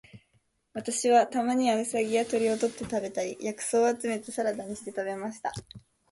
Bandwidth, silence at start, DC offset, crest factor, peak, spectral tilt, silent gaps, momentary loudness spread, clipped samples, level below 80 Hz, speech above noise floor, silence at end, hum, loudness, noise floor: 11.5 kHz; 0.15 s; under 0.1%; 18 dB; -12 dBFS; -3.5 dB/octave; none; 13 LU; under 0.1%; -64 dBFS; 43 dB; 0.35 s; none; -28 LUFS; -71 dBFS